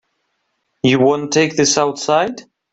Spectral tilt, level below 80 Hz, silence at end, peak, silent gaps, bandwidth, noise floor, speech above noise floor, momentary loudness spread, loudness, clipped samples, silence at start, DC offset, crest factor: -3.5 dB/octave; -56 dBFS; 0.3 s; -2 dBFS; none; 8.2 kHz; -69 dBFS; 54 dB; 6 LU; -15 LUFS; under 0.1%; 0.85 s; under 0.1%; 16 dB